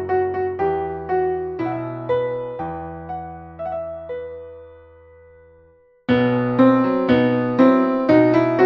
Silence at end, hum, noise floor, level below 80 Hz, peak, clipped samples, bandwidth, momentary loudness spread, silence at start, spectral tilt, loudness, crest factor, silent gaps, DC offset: 0 s; none; -53 dBFS; -50 dBFS; -2 dBFS; under 0.1%; 5.8 kHz; 16 LU; 0 s; -9 dB/octave; -19 LUFS; 18 dB; none; under 0.1%